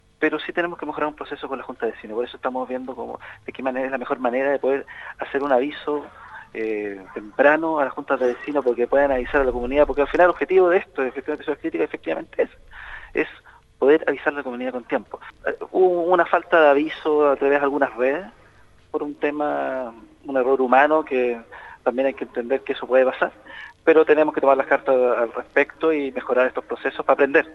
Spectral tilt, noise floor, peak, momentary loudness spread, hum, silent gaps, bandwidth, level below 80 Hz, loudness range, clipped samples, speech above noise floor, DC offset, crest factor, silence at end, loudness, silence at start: -6.5 dB/octave; -52 dBFS; -2 dBFS; 13 LU; none; none; 6.8 kHz; -48 dBFS; 6 LU; under 0.1%; 31 dB; under 0.1%; 20 dB; 0 s; -21 LUFS; 0.2 s